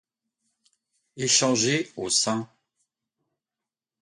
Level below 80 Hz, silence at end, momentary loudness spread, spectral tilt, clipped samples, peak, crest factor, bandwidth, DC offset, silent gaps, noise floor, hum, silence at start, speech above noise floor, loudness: -70 dBFS; 1.55 s; 11 LU; -2.5 dB/octave; under 0.1%; -6 dBFS; 22 dB; 11.5 kHz; under 0.1%; none; -90 dBFS; none; 1.15 s; 66 dB; -23 LUFS